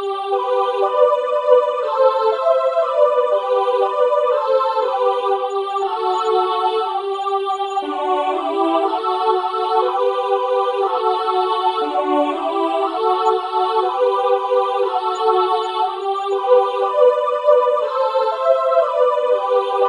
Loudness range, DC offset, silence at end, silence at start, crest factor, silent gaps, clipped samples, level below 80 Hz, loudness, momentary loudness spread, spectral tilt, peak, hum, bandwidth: 3 LU; under 0.1%; 0 s; 0 s; 16 dB; none; under 0.1%; -78 dBFS; -18 LUFS; 5 LU; -2 dB/octave; 0 dBFS; none; 10.5 kHz